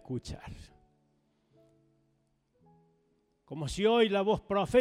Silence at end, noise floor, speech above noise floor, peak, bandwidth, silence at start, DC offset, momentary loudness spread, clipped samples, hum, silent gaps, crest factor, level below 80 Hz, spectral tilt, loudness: 0 s; -74 dBFS; 45 dB; -14 dBFS; 12 kHz; 0.1 s; under 0.1%; 21 LU; under 0.1%; none; none; 20 dB; -54 dBFS; -5.5 dB/octave; -29 LUFS